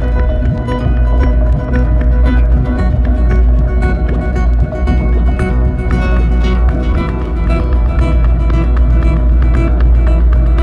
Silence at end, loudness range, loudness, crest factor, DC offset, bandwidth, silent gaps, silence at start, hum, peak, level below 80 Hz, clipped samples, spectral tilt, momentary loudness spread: 0 s; 1 LU; -13 LUFS; 10 dB; under 0.1%; 4.3 kHz; none; 0 s; none; 0 dBFS; -10 dBFS; under 0.1%; -9 dB/octave; 3 LU